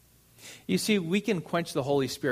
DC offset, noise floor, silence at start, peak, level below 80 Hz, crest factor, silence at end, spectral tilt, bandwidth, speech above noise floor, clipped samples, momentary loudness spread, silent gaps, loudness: under 0.1%; -53 dBFS; 0.4 s; -12 dBFS; -64 dBFS; 16 dB; 0 s; -5 dB/octave; 15.5 kHz; 25 dB; under 0.1%; 18 LU; none; -28 LUFS